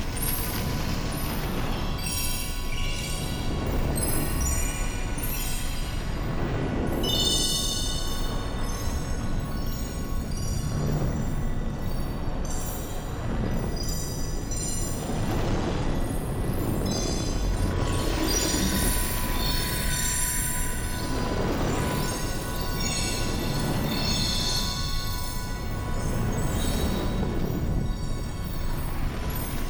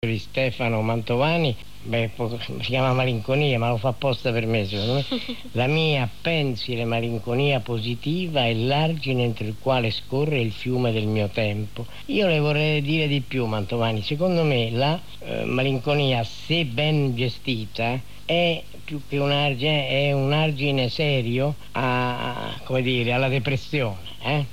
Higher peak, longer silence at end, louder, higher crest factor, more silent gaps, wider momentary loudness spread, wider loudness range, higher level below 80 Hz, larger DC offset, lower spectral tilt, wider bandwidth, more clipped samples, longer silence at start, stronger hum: about the same, -12 dBFS vs -10 dBFS; about the same, 0 s vs 0 s; second, -28 LUFS vs -23 LUFS; about the same, 14 dB vs 14 dB; neither; about the same, 8 LU vs 7 LU; first, 5 LU vs 2 LU; first, -30 dBFS vs -50 dBFS; second, under 0.1% vs 2%; second, -4 dB/octave vs -6.5 dB/octave; first, over 20 kHz vs 15.5 kHz; neither; about the same, 0 s vs 0 s; neither